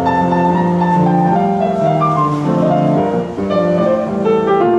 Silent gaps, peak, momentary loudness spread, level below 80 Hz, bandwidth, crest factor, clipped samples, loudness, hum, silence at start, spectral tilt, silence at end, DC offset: none; -4 dBFS; 3 LU; -46 dBFS; 8 kHz; 10 dB; under 0.1%; -14 LUFS; none; 0 s; -8.5 dB/octave; 0 s; under 0.1%